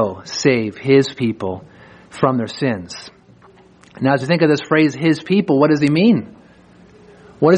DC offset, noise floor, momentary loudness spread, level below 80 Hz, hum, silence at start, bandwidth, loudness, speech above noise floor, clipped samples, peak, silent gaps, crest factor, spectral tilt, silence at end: under 0.1%; -47 dBFS; 13 LU; -58 dBFS; none; 0 s; 10 kHz; -17 LUFS; 31 dB; under 0.1%; 0 dBFS; none; 16 dB; -6.5 dB/octave; 0 s